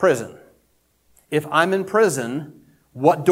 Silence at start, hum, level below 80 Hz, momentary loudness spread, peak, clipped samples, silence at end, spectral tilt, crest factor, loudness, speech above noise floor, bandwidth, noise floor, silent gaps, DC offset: 0 s; none; -64 dBFS; 13 LU; -2 dBFS; under 0.1%; 0 s; -5 dB/octave; 20 dB; -20 LUFS; 45 dB; 16.5 kHz; -63 dBFS; none; under 0.1%